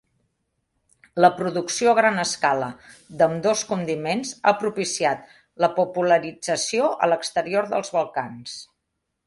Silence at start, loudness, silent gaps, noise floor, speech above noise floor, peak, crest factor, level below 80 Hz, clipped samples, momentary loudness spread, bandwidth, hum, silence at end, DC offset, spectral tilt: 1.15 s; -22 LUFS; none; -78 dBFS; 56 dB; -2 dBFS; 20 dB; -66 dBFS; under 0.1%; 12 LU; 11.5 kHz; none; 0.6 s; under 0.1%; -3.5 dB/octave